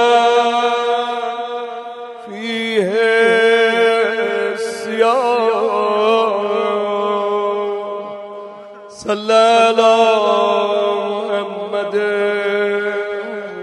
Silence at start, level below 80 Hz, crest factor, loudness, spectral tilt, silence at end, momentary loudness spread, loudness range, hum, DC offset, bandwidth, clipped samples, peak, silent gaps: 0 s; -70 dBFS; 16 dB; -16 LUFS; -3.5 dB/octave; 0 s; 15 LU; 4 LU; none; under 0.1%; 11.5 kHz; under 0.1%; 0 dBFS; none